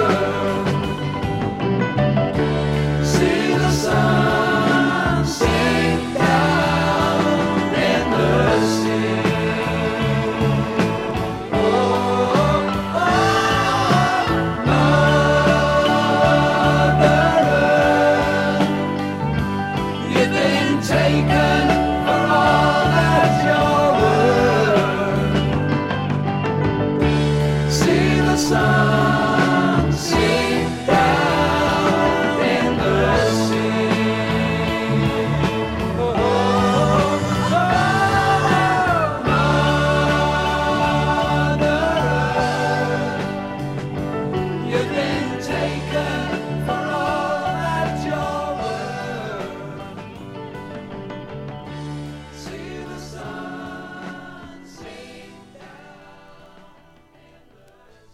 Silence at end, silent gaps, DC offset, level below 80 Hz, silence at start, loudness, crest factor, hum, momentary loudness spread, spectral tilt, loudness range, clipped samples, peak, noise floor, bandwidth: 1.8 s; none; under 0.1%; -36 dBFS; 0 s; -18 LUFS; 16 dB; none; 13 LU; -6 dB/octave; 13 LU; under 0.1%; -2 dBFS; -50 dBFS; 14.5 kHz